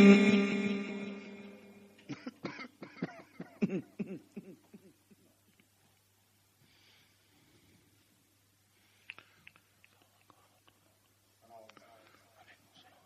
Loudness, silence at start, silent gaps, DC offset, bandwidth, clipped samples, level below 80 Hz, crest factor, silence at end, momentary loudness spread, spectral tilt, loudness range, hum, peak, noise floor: -33 LUFS; 0 s; none; under 0.1%; 9.2 kHz; under 0.1%; -76 dBFS; 26 dB; 8.55 s; 27 LU; -7 dB/octave; 21 LU; none; -10 dBFS; -70 dBFS